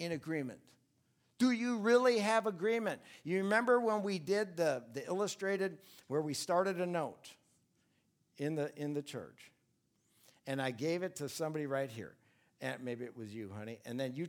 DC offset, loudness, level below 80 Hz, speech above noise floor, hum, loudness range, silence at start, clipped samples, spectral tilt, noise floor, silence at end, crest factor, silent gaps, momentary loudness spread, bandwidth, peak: under 0.1%; -36 LUFS; -86 dBFS; 42 dB; none; 9 LU; 0 s; under 0.1%; -5 dB/octave; -78 dBFS; 0 s; 20 dB; none; 16 LU; 18 kHz; -18 dBFS